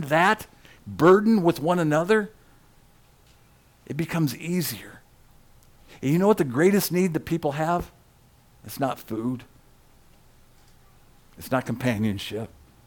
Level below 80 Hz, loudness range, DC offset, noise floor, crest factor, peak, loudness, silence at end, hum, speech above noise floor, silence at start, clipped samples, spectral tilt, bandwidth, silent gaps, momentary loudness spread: -54 dBFS; 10 LU; under 0.1%; -57 dBFS; 18 dB; -8 dBFS; -24 LUFS; 0.4 s; none; 34 dB; 0 s; under 0.1%; -6 dB/octave; 19 kHz; none; 17 LU